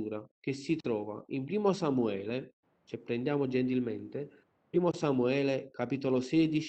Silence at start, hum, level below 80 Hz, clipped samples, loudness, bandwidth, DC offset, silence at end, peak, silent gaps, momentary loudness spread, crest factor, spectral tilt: 0 s; none; -70 dBFS; under 0.1%; -32 LUFS; 8.6 kHz; under 0.1%; 0 s; -14 dBFS; 0.31-0.42 s, 2.53-2.63 s; 11 LU; 18 dB; -7 dB/octave